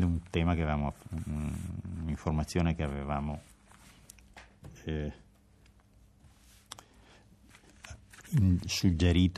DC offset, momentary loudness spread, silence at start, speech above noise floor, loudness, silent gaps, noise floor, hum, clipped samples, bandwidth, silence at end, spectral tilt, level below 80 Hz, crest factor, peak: under 0.1%; 24 LU; 0 s; 31 dB; -32 LUFS; none; -61 dBFS; none; under 0.1%; 13.5 kHz; 0 s; -6.5 dB/octave; -46 dBFS; 18 dB; -14 dBFS